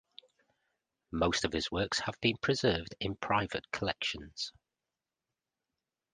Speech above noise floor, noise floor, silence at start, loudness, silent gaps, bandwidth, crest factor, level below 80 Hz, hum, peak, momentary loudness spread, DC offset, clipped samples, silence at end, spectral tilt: over 57 dB; under -90 dBFS; 1.1 s; -33 LUFS; none; 9.6 kHz; 24 dB; -54 dBFS; none; -12 dBFS; 9 LU; under 0.1%; under 0.1%; 1.65 s; -4 dB/octave